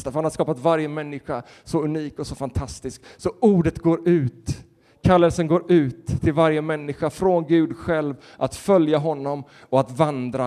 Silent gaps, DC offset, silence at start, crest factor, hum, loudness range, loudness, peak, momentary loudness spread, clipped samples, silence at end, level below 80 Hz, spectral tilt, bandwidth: none; under 0.1%; 0 s; 18 dB; none; 4 LU; -22 LUFS; -4 dBFS; 13 LU; under 0.1%; 0 s; -44 dBFS; -7 dB/octave; 13 kHz